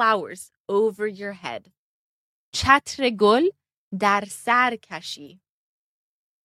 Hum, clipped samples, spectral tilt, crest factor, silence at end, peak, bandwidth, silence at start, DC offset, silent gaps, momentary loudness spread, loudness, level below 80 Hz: none; under 0.1%; -4 dB/octave; 22 dB; 1.15 s; -2 dBFS; 14.5 kHz; 0 s; under 0.1%; 0.57-0.65 s, 1.78-2.52 s, 3.77-3.91 s; 18 LU; -22 LUFS; -54 dBFS